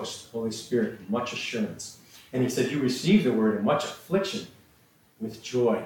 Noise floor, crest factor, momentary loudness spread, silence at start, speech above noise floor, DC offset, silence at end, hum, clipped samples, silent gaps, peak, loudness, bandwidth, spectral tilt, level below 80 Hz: -61 dBFS; 18 dB; 16 LU; 0 s; 34 dB; under 0.1%; 0 s; none; under 0.1%; none; -10 dBFS; -27 LUFS; 17.5 kHz; -5.5 dB/octave; -66 dBFS